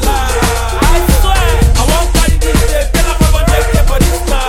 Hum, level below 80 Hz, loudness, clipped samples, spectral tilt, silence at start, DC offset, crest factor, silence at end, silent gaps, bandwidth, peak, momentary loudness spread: none; -10 dBFS; -12 LUFS; under 0.1%; -4.5 dB/octave; 0 s; under 0.1%; 10 dB; 0 s; none; 17 kHz; 0 dBFS; 3 LU